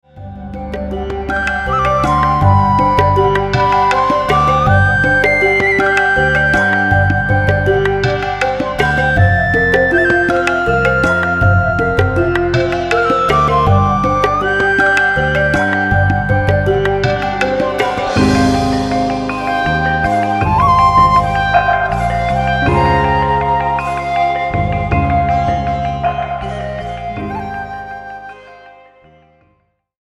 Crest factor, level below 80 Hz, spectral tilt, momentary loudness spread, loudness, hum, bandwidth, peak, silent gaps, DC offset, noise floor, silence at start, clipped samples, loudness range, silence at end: 14 dB; -28 dBFS; -6.5 dB/octave; 10 LU; -13 LUFS; none; 12 kHz; 0 dBFS; none; under 0.1%; -60 dBFS; 0.15 s; under 0.1%; 6 LU; 1.3 s